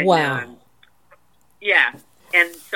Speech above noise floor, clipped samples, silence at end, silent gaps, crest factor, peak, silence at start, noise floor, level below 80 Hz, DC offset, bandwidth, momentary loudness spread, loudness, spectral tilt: 39 dB; under 0.1%; 0 s; none; 20 dB; -2 dBFS; 0 s; -58 dBFS; -70 dBFS; 0.2%; 17.5 kHz; 11 LU; -18 LUFS; -4.5 dB/octave